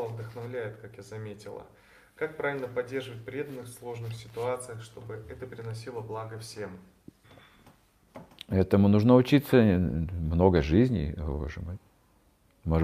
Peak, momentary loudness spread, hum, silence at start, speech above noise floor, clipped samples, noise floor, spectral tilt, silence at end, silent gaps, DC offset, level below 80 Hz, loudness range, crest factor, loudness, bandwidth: -6 dBFS; 20 LU; none; 0 s; 36 dB; under 0.1%; -64 dBFS; -7.5 dB/octave; 0 s; none; under 0.1%; -46 dBFS; 16 LU; 22 dB; -28 LUFS; 15 kHz